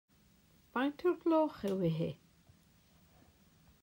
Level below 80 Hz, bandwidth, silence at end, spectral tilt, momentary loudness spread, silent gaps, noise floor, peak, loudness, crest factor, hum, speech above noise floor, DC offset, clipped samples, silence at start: -70 dBFS; 16 kHz; 1.7 s; -8 dB/octave; 10 LU; none; -67 dBFS; -22 dBFS; -35 LUFS; 16 dB; none; 34 dB; under 0.1%; under 0.1%; 0.75 s